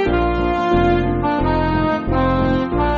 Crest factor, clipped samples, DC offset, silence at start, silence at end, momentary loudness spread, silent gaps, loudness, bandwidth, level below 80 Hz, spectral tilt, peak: 12 dB; under 0.1%; under 0.1%; 0 s; 0 s; 3 LU; none; -18 LUFS; 7 kHz; -26 dBFS; -6 dB/octave; -4 dBFS